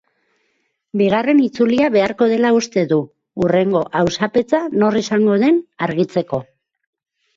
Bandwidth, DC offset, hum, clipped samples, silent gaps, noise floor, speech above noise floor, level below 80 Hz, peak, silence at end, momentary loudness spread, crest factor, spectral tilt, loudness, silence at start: 7.6 kHz; under 0.1%; none; under 0.1%; none; -67 dBFS; 52 dB; -54 dBFS; -2 dBFS; 0.95 s; 7 LU; 14 dB; -6 dB/octave; -17 LUFS; 0.95 s